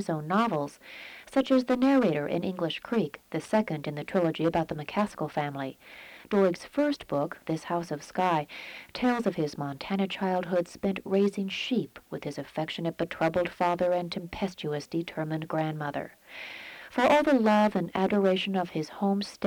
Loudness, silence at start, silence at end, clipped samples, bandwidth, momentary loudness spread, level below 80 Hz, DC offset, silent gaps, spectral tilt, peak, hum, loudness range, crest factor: -29 LUFS; 0 s; 0 s; under 0.1%; 19.5 kHz; 14 LU; -62 dBFS; under 0.1%; none; -6.5 dB/octave; -12 dBFS; none; 4 LU; 16 dB